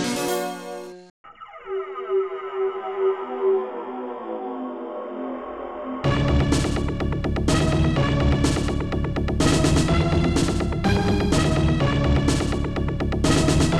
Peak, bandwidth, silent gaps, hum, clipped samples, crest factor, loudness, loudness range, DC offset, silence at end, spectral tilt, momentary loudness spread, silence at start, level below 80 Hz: -6 dBFS; 16 kHz; 1.10-1.24 s; none; under 0.1%; 16 dB; -23 LUFS; 7 LU; under 0.1%; 0 s; -6 dB/octave; 12 LU; 0 s; -30 dBFS